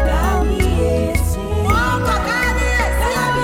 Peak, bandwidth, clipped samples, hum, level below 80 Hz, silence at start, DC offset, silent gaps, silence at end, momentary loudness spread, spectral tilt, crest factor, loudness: -2 dBFS; 16.5 kHz; under 0.1%; none; -20 dBFS; 0 s; under 0.1%; none; 0 s; 3 LU; -5.5 dB/octave; 14 dB; -17 LUFS